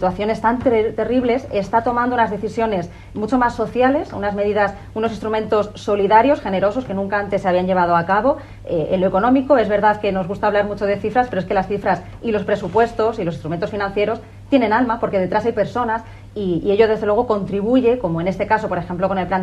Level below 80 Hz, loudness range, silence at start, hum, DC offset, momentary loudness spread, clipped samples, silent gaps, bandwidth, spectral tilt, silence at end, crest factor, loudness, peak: -42 dBFS; 3 LU; 0 s; none; under 0.1%; 7 LU; under 0.1%; none; 11 kHz; -7.5 dB/octave; 0 s; 18 dB; -19 LUFS; 0 dBFS